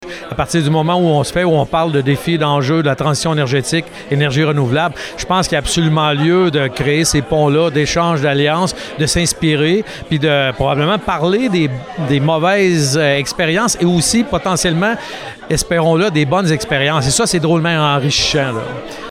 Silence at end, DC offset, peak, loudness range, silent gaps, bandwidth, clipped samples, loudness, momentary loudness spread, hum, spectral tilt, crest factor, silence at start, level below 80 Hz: 0 s; under 0.1%; -4 dBFS; 1 LU; none; 15 kHz; under 0.1%; -14 LUFS; 6 LU; none; -4.5 dB/octave; 12 dB; 0 s; -38 dBFS